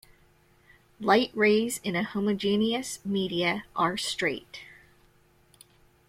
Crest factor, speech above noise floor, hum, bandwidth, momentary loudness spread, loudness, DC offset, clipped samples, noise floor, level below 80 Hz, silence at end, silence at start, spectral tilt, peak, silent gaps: 20 dB; 35 dB; none; 16 kHz; 9 LU; -27 LUFS; under 0.1%; under 0.1%; -62 dBFS; -64 dBFS; 1.45 s; 1 s; -4 dB/octave; -8 dBFS; none